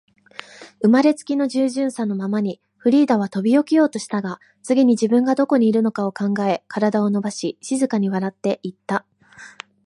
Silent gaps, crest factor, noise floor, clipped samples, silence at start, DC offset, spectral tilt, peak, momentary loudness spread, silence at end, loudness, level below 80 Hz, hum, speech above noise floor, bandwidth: none; 16 dB; -45 dBFS; under 0.1%; 0.6 s; under 0.1%; -6 dB/octave; -4 dBFS; 11 LU; 0.35 s; -20 LUFS; -72 dBFS; none; 26 dB; 11.5 kHz